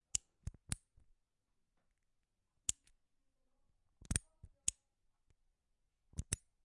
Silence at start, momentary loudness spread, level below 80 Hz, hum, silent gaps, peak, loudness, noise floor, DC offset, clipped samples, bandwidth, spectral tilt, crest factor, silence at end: 0.15 s; 12 LU; -58 dBFS; none; none; -14 dBFS; -43 LUFS; -84 dBFS; under 0.1%; under 0.1%; 11.5 kHz; -2 dB/octave; 34 dB; 0.3 s